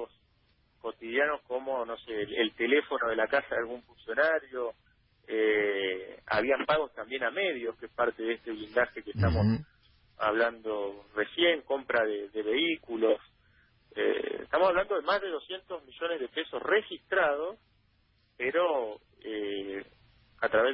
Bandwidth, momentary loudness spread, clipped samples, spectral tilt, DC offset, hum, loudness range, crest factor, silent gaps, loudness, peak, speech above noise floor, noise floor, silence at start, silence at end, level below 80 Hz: 5.8 kHz; 11 LU; under 0.1%; -9 dB/octave; under 0.1%; none; 2 LU; 18 dB; none; -30 LUFS; -14 dBFS; 39 dB; -69 dBFS; 0 s; 0 s; -52 dBFS